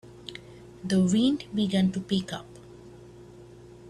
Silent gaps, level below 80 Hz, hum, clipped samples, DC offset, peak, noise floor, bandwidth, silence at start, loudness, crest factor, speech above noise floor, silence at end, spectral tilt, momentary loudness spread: none; -58 dBFS; none; under 0.1%; under 0.1%; -12 dBFS; -48 dBFS; 11 kHz; 0.05 s; -26 LUFS; 16 dB; 23 dB; 0 s; -6 dB/octave; 25 LU